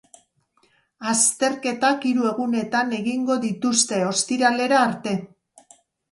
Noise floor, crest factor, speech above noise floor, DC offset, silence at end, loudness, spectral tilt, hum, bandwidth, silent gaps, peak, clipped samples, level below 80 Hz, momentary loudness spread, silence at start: -64 dBFS; 20 dB; 43 dB; under 0.1%; 0.85 s; -21 LUFS; -3 dB/octave; none; 11.5 kHz; none; -4 dBFS; under 0.1%; -70 dBFS; 6 LU; 1 s